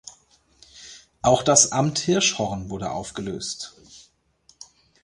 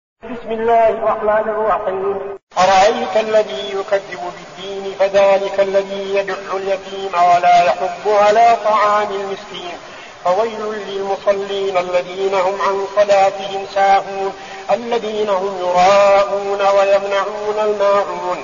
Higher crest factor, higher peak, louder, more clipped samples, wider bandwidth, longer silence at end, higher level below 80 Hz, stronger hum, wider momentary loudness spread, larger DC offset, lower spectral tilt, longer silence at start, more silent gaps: first, 24 dB vs 14 dB; about the same, -2 dBFS vs -2 dBFS; second, -21 LUFS vs -16 LUFS; neither; first, 11.5 kHz vs 7.4 kHz; first, 0.4 s vs 0 s; about the same, -52 dBFS vs -52 dBFS; neither; first, 25 LU vs 13 LU; second, under 0.1% vs 0.2%; first, -3 dB/octave vs -1.5 dB/octave; second, 0.05 s vs 0.25 s; second, none vs 2.43-2.47 s